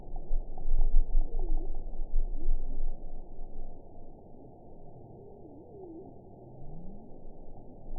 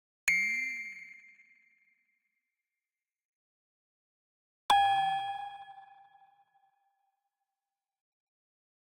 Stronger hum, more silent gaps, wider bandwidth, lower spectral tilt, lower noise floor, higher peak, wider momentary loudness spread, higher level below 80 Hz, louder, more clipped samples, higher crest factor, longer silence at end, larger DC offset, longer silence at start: neither; second, none vs 3.25-4.69 s; second, 0.9 kHz vs 16 kHz; first, -15 dB/octave vs 0 dB/octave; second, -49 dBFS vs under -90 dBFS; about the same, -10 dBFS vs -12 dBFS; second, 18 LU vs 23 LU; first, -30 dBFS vs -74 dBFS; second, -40 LUFS vs -30 LUFS; neither; second, 18 dB vs 26 dB; second, 0 s vs 3.05 s; neither; second, 0 s vs 0.25 s